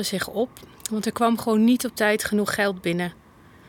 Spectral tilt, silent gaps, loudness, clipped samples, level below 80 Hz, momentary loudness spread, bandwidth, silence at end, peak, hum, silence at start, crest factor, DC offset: -4.5 dB/octave; none; -23 LUFS; under 0.1%; -56 dBFS; 10 LU; 18.5 kHz; 0.55 s; -6 dBFS; none; 0 s; 18 dB; under 0.1%